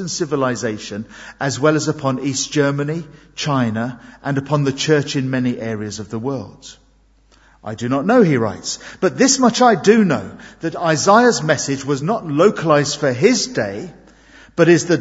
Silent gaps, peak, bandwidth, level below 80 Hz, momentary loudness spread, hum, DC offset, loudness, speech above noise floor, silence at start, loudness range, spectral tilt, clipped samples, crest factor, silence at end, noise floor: none; 0 dBFS; 8 kHz; -54 dBFS; 15 LU; none; under 0.1%; -17 LUFS; 36 dB; 0 s; 6 LU; -4.5 dB/octave; under 0.1%; 18 dB; 0 s; -54 dBFS